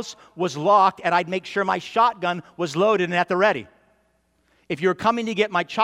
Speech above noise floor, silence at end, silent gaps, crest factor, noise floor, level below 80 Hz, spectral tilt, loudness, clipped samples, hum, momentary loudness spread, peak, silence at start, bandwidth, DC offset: 44 dB; 0 s; none; 18 dB; -66 dBFS; -66 dBFS; -5 dB/octave; -21 LUFS; under 0.1%; none; 10 LU; -4 dBFS; 0 s; 12.5 kHz; under 0.1%